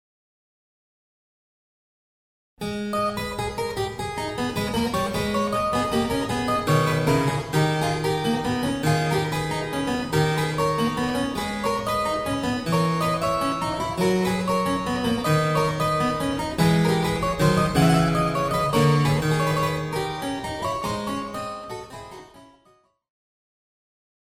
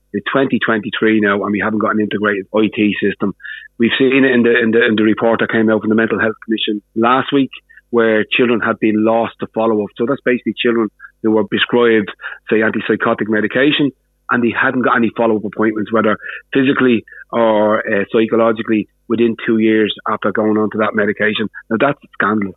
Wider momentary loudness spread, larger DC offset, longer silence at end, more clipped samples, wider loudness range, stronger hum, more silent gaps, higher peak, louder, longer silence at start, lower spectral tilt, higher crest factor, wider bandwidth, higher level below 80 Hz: about the same, 8 LU vs 6 LU; neither; first, 1.75 s vs 0.05 s; neither; first, 10 LU vs 2 LU; neither; neither; second, -6 dBFS vs -2 dBFS; second, -23 LUFS vs -15 LUFS; first, 2.6 s vs 0.15 s; second, -5.5 dB/octave vs -9 dB/octave; first, 18 dB vs 12 dB; first, 16 kHz vs 4.1 kHz; first, -44 dBFS vs -56 dBFS